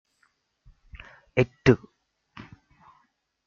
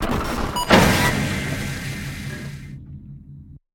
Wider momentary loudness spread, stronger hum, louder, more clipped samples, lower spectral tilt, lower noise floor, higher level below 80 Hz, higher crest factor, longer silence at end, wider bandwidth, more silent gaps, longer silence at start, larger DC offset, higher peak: about the same, 26 LU vs 24 LU; neither; second, -24 LUFS vs -20 LUFS; neither; first, -7.5 dB/octave vs -4.5 dB/octave; first, -70 dBFS vs -42 dBFS; second, -52 dBFS vs -34 dBFS; about the same, 26 dB vs 22 dB; first, 1.7 s vs 0.15 s; second, 7.2 kHz vs 17 kHz; neither; first, 1.35 s vs 0 s; neither; second, -4 dBFS vs 0 dBFS